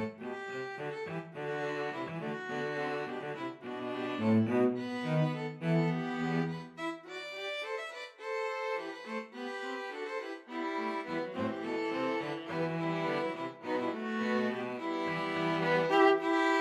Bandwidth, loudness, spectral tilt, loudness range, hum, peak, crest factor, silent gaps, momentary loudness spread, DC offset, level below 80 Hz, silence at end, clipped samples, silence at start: 12 kHz; -34 LUFS; -6.5 dB/octave; 6 LU; none; -14 dBFS; 20 dB; none; 11 LU; under 0.1%; -80 dBFS; 0 s; under 0.1%; 0 s